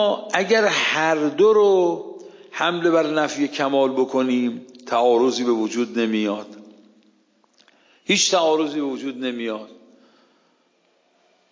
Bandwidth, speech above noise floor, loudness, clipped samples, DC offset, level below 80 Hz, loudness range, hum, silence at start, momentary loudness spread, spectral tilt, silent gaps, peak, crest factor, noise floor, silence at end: 7.6 kHz; 44 dB; -20 LUFS; under 0.1%; under 0.1%; -78 dBFS; 4 LU; none; 0 s; 14 LU; -3.5 dB/octave; none; -2 dBFS; 20 dB; -63 dBFS; 1.8 s